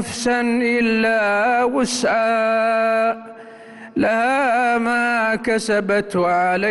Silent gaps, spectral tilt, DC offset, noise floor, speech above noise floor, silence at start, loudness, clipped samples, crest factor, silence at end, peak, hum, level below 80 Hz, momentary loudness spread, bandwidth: none; -4 dB/octave; under 0.1%; -39 dBFS; 21 dB; 0 s; -18 LUFS; under 0.1%; 10 dB; 0 s; -10 dBFS; none; -54 dBFS; 3 LU; 12 kHz